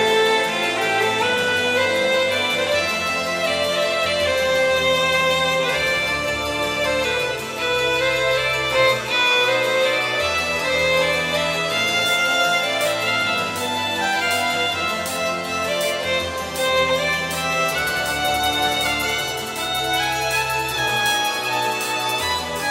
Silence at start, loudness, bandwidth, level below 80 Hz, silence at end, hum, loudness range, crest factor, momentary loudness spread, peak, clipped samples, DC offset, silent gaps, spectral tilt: 0 s; -19 LUFS; 16.5 kHz; -48 dBFS; 0 s; none; 3 LU; 16 dB; 5 LU; -6 dBFS; under 0.1%; under 0.1%; none; -2 dB/octave